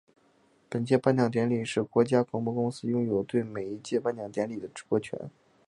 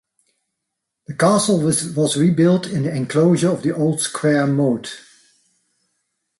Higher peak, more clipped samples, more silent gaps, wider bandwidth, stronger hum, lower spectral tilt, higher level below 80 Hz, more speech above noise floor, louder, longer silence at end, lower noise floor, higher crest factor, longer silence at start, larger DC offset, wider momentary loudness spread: second, -8 dBFS vs -4 dBFS; neither; neither; about the same, 11 kHz vs 12 kHz; neither; first, -7 dB/octave vs -5.5 dB/octave; second, -68 dBFS vs -60 dBFS; second, 37 dB vs 62 dB; second, -29 LUFS vs -18 LUFS; second, 0.4 s vs 1.4 s; second, -65 dBFS vs -79 dBFS; about the same, 20 dB vs 16 dB; second, 0.7 s vs 1.1 s; neither; first, 12 LU vs 7 LU